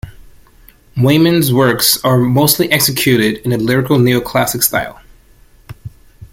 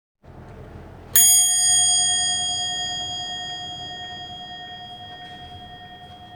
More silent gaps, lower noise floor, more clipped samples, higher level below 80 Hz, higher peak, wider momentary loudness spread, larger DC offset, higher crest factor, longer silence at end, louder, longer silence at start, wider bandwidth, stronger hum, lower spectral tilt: neither; about the same, -45 dBFS vs -42 dBFS; neither; first, -42 dBFS vs -52 dBFS; about the same, 0 dBFS vs 0 dBFS; second, 13 LU vs 25 LU; neither; second, 14 dB vs 24 dB; about the same, 0.05 s vs 0 s; first, -12 LUFS vs -17 LUFS; second, 0.05 s vs 0.3 s; second, 17 kHz vs over 20 kHz; neither; first, -4.5 dB/octave vs 1 dB/octave